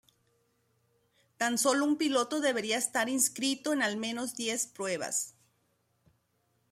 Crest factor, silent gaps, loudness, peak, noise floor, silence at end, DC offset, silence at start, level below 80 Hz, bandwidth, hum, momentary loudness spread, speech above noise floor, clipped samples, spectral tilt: 20 dB; none; -30 LUFS; -12 dBFS; -75 dBFS; 1.4 s; under 0.1%; 1.4 s; -82 dBFS; 16 kHz; none; 7 LU; 44 dB; under 0.1%; -1.5 dB/octave